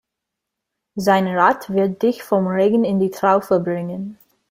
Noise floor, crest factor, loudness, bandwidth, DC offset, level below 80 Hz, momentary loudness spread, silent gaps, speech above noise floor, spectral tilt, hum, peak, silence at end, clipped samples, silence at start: -82 dBFS; 18 dB; -18 LUFS; 16 kHz; under 0.1%; -62 dBFS; 11 LU; none; 64 dB; -7 dB/octave; none; -2 dBFS; 0.35 s; under 0.1%; 0.95 s